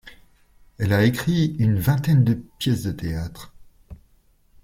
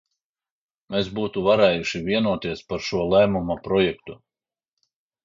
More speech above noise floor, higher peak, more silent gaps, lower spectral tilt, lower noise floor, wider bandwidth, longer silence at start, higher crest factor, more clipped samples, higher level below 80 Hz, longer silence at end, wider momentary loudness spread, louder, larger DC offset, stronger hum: second, 38 dB vs over 68 dB; about the same, -6 dBFS vs -4 dBFS; neither; about the same, -7 dB/octave vs -6 dB/octave; second, -58 dBFS vs under -90 dBFS; first, 16.5 kHz vs 7.6 kHz; second, 0.05 s vs 0.9 s; about the same, 18 dB vs 20 dB; neither; about the same, -46 dBFS vs -50 dBFS; second, 0.7 s vs 1.1 s; about the same, 11 LU vs 10 LU; about the same, -22 LUFS vs -22 LUFS; neither; neither